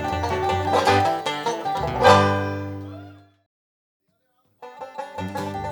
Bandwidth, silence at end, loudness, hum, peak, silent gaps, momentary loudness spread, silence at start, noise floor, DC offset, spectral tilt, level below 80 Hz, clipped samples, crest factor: 19 kHz; 0 s; -21 LUFS; none; 0 dBFS; 3.46-4.00 s; 20 LU; 0 s; -68 dBFS; under 0.1%; -5 dB/octave; -48 dBFS; under 0.1%; 22 dB